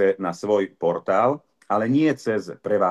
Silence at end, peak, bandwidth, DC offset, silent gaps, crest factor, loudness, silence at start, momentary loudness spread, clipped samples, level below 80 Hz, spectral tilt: 0 s; -6 dBFS; 11.5 kHz; under 0.1%; none; 16 dB; -23 LUFS; 0 s; 6 LU; under 0.1%; -72 dBFS; -7 dB/octave